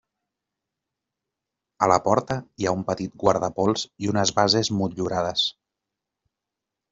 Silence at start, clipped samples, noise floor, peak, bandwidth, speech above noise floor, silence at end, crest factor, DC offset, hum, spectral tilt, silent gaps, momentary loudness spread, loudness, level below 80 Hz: 1.8 s; under 0.1%; -86 dBFS; -4 dBFS; 7.8 kHz; 63 dB; 1.4 s; 22 dB; under 0.1%; none; -4.5 dB/octave; none; 7 LU; -23 LUFS; -58 dBFS